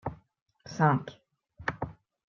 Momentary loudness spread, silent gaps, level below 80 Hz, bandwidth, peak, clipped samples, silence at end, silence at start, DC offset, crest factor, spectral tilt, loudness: 20 LU; 0.41-0.46 s; -60 dBFS; 7 kHz; -12 dBFS; under 0.1%; 0.35 s; 0.05 s; under 0.1%; 22 dB; -7.5 dB/octave; -31 LUFS